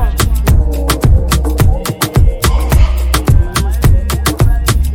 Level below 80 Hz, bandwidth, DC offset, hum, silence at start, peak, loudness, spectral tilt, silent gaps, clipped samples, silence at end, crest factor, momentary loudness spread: -12 dBFS; 17 kHz; under 0.1%; none; 0 s; 0 dBFS; -13 LUFS; -5 dB/octave; none; under 0.1%; 0 s; 10 dB; 3 LU